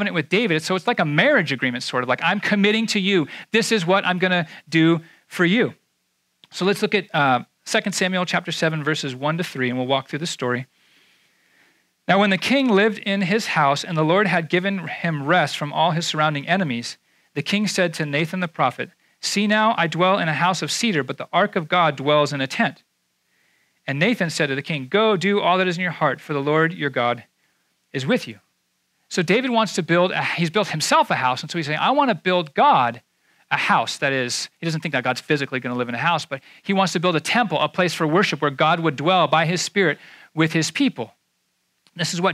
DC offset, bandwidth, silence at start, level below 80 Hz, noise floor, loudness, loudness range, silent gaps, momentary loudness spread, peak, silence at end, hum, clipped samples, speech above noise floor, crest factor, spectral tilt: under 0.1%; 15 kHz; 0 s; -76 dBFS; -70 dBFS; -20 LUFS; 4 LU; none; 7 LU; -2 dBFS; 0 s; none; under 0.1%; 50 dB; 18 dB; -4.5 dB/octave